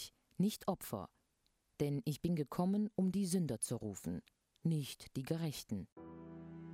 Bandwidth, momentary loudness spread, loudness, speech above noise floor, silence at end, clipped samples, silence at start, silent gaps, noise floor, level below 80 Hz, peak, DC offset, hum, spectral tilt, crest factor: 16 kHz; 16 LU; -40 LUFS; 41 dB; 0 s; under 0.1%; 0 s; 5.92-5.96 s; -80 dBFS; -68 dBFS; -24 dBFS; under 0.1%; none; -6 dB/octave; 16 dB